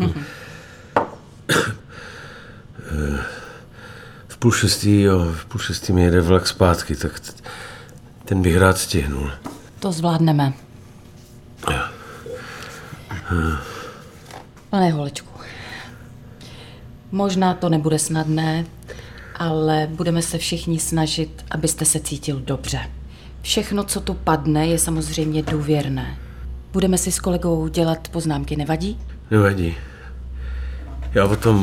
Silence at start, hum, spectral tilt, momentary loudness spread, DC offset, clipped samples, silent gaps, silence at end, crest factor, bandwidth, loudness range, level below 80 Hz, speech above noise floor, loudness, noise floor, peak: 0 s; none; -5 dB/octave; 21 LU; under 0.1%; under 0.1%; none; 0 s; 22 dB; 16.5 kHz; 7 LU; -36 dBFS; 24 dB; -20 LUFS; -43 dBFS; 0 dBFS